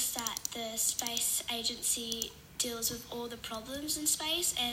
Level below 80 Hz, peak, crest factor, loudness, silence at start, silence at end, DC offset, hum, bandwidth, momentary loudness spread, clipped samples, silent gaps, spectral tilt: -62 dBFS; -16 dBFS; 20 dB; -33 LUFS; 0 s; 0 s; under 0.1%; none; 16.5 kHz; 10 LU; under 0.1%; none; -0.5 dB/octave